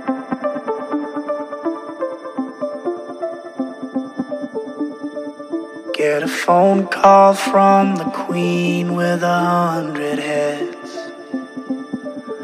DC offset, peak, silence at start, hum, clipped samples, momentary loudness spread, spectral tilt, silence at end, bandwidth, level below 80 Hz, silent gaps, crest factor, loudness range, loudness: under 0.1%; 0 dBFS; 0 s; none; under 0.1%; 15 LU; -6 dB/octave; 0 s; 15 kHz; -68 dBFS; none; 18 dB; 12 LU; -19 LUFS